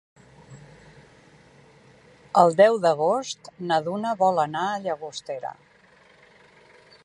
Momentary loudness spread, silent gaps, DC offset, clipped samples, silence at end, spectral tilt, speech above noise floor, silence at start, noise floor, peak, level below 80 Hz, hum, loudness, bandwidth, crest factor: 17 LU; none; under 0.1%; under 0.1%; 1.5 s; -5 dB/octave; 33 dB; 0.5 s; -56 dBFS; -4 dBFS; -70 dBFS; none; -23 LUFS; 11.5 kHz; 22 dB